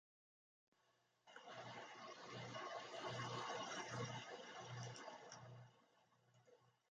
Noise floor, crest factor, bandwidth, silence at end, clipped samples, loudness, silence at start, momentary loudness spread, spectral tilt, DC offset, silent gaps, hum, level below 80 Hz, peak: -82 dBFS; 18 dB; 9 kHz; 0.2 s; under 0.1%; -52 LUFS; 1.25 s; 12 LU; -4 dB/octave; under 0.1%; none; none; -86 dBFS; -36 dBFS